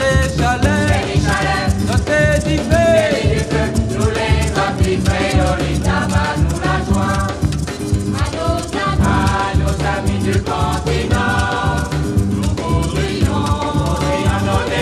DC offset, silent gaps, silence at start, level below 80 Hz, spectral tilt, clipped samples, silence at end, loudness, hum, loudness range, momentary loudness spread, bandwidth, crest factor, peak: under 0.1%; none; 0 s; -24 dBFS; -5.5 dB/octave; under 0.1%; 0 s; -16 LUFS; none; 3 LU; 4 LU; 14 kHz; 14 dB; 0 dBFS